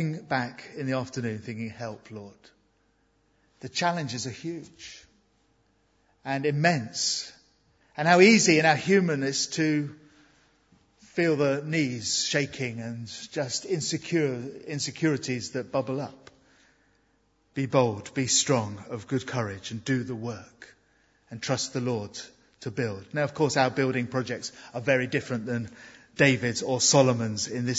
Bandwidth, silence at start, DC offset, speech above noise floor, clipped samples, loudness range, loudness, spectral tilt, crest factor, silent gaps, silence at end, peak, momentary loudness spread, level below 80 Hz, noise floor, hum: 8 kHz; 0 s; under 0.1%; 41 dB; under 0.1%; 12 LU; -26 LUFS; -4 dB/octave; 24 dB; none; 0 s; -4 dBFS; 17 LU; -68 dBFS; -68 dBFS; none